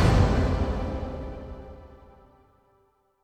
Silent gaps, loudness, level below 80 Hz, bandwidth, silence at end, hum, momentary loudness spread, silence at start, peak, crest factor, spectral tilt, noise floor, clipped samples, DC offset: none; -27 LUFS; -32 dBFS; 12 kHz; 1.3 s; none; 22 LU; 0 s; -8 dBFS; 18 dB; -7 dB/octave; -66 dBFS; under 0.1%; under 0.1%